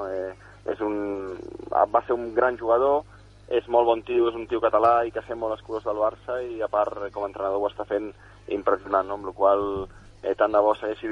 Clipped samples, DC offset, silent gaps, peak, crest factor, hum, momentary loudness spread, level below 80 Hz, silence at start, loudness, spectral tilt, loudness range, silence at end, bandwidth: under 0.1%; under 0.1%; none; -6 dBFS; 18 dB; 50 Hz at -50 dBFS; 12 LU; -54 dBFS; 0 s; -25 LUFS; -7 dB/octave; 5 LU; 0 s; 7.2 kHz